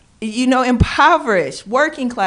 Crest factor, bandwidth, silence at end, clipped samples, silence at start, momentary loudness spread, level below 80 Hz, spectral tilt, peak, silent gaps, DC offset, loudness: 14 dB; 10.5 kHz; 0 s; under 0.1%; 0.2 s; 7 LU; -32 dBFS; -5.5 dB/octave; -2 dBFS; none; under 0.1%; -15 LUFS